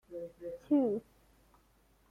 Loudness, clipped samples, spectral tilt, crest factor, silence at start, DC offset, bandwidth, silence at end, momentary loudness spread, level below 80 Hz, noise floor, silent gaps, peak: -35 LUFS; under 0.1%; -9 dB/octave; 18 dB; 0.1 s; under 0.1%; 3.6 kHz; 1.1 s; 16 LU; -70 dBFS; -68 dBFS; none; -20 dBFS